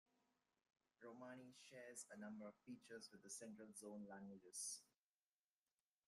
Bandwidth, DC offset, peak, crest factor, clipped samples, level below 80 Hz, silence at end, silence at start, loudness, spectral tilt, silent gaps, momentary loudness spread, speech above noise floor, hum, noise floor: 15 kHz; under 0.1%; -38 dBFS; 22 dB; under 0.1%; under -90 dBFS; 1.2 s; 1 s; -57 LUFS; -3 dB/octave; none; 10 LU; over 32 dB; none; under -90 dBFS